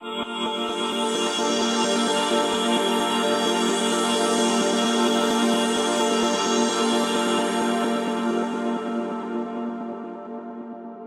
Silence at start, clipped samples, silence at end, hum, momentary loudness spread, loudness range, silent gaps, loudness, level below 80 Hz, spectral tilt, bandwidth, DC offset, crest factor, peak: 0 s; under 0.1%; 0 s; none; 10 LU; 5 LU; none; -22 LUFS; -68 dBFS; -3 dB/octave; 15 kHz; under 0.1%; 14 dB; -8 dBFS